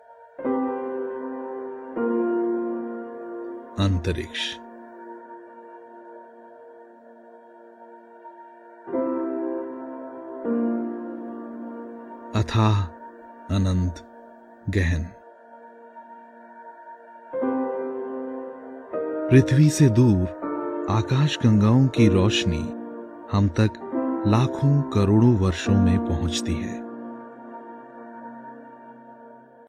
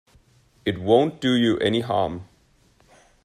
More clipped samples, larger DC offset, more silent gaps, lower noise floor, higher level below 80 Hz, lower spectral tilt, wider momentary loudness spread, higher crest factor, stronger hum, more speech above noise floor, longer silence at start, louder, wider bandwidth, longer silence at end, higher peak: neither; neither; neither; second, -48 dBFS vs -59 dBFS; first, -46 dBFS vs -56 dBFS; about the same, -7 dB/octave vs -6.5 dB/octave; first, 26 LU vs 10 LU; about the same, 20 dB vs 20 dB; neither; second, 28 dB vs 38 dB; second, 0.1 s vs 0.65 s; about the same, -23 LUFS vs -22 LUFS; about the same, 13.5 kHz vs 13 kHz; second, 0.3 s vs 1 s; about the same, -4 dBFS vs -4 dBFS